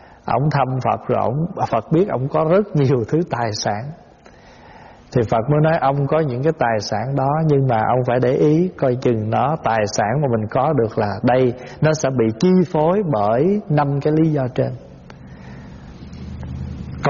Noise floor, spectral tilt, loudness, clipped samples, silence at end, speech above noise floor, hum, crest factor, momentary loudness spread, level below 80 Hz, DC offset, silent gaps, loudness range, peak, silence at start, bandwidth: -45 dBFS; -7 dB/octave; -18 LUFS; under 0.1%; 0 s; 28 dB; none; 14 dB; 14 LU; -46 dBFS; under 0.1%; none; 3 LU; -4 dBFS; 0.25 s; 7.2 kHz